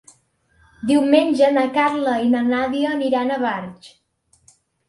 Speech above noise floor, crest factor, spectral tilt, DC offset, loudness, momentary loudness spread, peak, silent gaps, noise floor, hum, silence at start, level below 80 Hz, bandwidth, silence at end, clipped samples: 44 dB; 18 dB; -5 dB/octave; under 0.1%; -19 LUFS; 9 LU; -2 dBFS; none; -62 dBFS; none; 0.8 s; -60 dBFS; 11.5 kHz; 1 s; under 0.1%